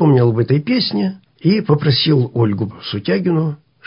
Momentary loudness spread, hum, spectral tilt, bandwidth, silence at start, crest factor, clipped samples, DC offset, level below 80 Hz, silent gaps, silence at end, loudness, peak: 9 LU; none; -11.5 dB/octave; 5.4 kHz; 0 s; 14 dB; under 0.1%; under 0.1%; -50 dBFS; none; 0.3 s; -16 LUFS; -2 dBFS